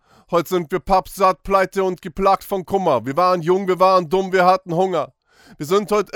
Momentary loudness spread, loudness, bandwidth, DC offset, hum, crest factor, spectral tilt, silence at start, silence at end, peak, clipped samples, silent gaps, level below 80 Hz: 7 LU; -18 LUFS; 19 kHz; under 0.1%; none; 16 dB; -6 dB/octave; 0.3 s; 0.1 s; -2 dBFS; under 0.1%; none; -44 dBFS